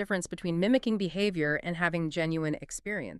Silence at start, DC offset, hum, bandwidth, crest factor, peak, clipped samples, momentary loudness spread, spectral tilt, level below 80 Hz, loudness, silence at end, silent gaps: 0 s; under 0.1%; none; 12.5 kHz; 18 dB; -12 dBFS; under 0.1%; 7 LU; -5.5 dB/octave; -58 dBFS; -30 LUFS; 0 s; none